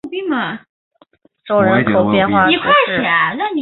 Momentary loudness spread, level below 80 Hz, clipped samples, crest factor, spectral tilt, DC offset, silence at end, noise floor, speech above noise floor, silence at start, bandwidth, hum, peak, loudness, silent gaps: 9 LU; -50 dBFS; under 0.1%; 14 dB; -9 dB/octave; under 0.1%; 0 s; -53 dBFS; 39 dB; 0.05 s; 4.3 kHz; none; 0 dBFS; -14 LUFS; 0.69-0.91 s